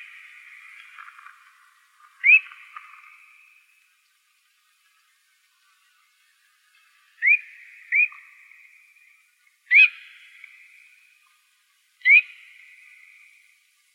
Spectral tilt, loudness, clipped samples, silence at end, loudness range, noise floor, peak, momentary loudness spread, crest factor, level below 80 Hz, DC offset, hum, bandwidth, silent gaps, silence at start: 9.5 dB/octave; -17 LUFS; under 0.1%; 1.7 s; 5 LU; -65 dBFS; -4 dBFS; 30 LU; 22 dB; under -90 dBFS; under 0.1%; none; 12 kHz; none; 2.25 s